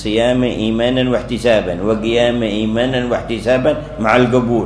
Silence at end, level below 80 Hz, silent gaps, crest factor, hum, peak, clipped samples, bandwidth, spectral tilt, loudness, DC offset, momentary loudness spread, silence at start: 0 s; -34 dBFS; none; 14 dB; none; 0 dBFS; under 0.1%; 11 kHz; -6 dB/octave; -15 LUFS; under 0.1%; 5 LU; 0 s